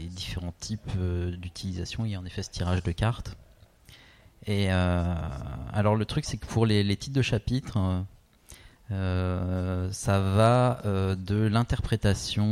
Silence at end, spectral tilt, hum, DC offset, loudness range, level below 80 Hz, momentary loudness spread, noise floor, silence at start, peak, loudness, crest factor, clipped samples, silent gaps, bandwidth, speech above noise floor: 0 s; -6 dB/octave; none; under 0.1%; 6 LU; -42 dBFS; 11 LU; -54 dBFS; 0 s; -8 dBFS; -28 LUFS; 18 dB; under 0.1%; none; 13.5 kHz; 27 dB